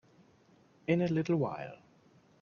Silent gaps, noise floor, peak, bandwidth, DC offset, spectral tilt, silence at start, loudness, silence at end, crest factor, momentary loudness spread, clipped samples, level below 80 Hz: none; -65 dBFS; -16 dBFS; 7 kHz; under 0.1%; -8 dB/octave; 0.9 s; -33 LUFS; 0.65 s; 20 dB; 14 LU; under 0.1%; -72 dBFS